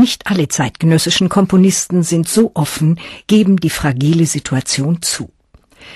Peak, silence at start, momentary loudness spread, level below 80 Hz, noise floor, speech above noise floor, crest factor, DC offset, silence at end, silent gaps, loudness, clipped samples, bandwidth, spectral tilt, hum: -2 dBFS; 0 s; 6 LU; -44 dBFS; -45 dBFS; 32 dB; 12 dB; under 0.1%; 0 s; none; -14 LUFS; under 0.1%; 13 kHz; -5 dB/octave; none